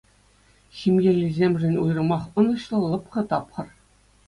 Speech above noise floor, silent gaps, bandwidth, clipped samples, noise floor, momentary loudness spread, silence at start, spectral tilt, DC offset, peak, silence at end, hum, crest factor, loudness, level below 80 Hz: 36 dB; none; 11 kHz; under 0.1%; -58 dBFS; 8 LU; 0.75 s; -8.5 dB/octave; under 0.1%; -6 dBFS; 0.6 s; 50 Hz at -50 dBFS; 16 dB; -23 LUFS; -56 dBFS